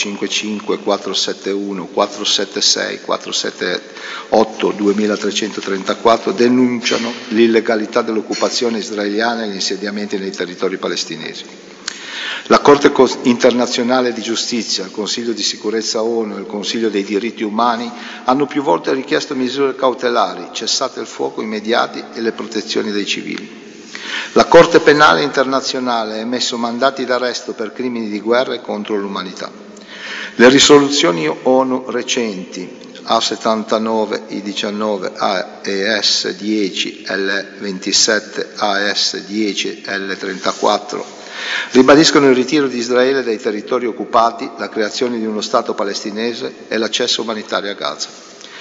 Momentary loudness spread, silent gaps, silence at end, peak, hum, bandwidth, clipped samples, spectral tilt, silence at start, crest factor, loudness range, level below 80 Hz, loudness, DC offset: 13 LU; none; 0 s; 0 dBFS; none; 8 kHz; under 0.1%; -3 dB/octave; 0 s; 16 dB; 6 LU; -54 dBFS; -16 LUFS; under 0.1%